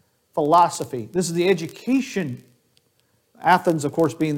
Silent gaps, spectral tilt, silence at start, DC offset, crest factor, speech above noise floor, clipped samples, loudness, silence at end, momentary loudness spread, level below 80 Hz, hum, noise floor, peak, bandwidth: none; -5.5 dB/octave; 0.35 s; under 0.1%; 18 dB; 45 dB; under 0.1%; -21 LUFS; 0 s; 12 LU; -64 dBFS; none; -65 dBFS; -4 dBFS; 17 kHz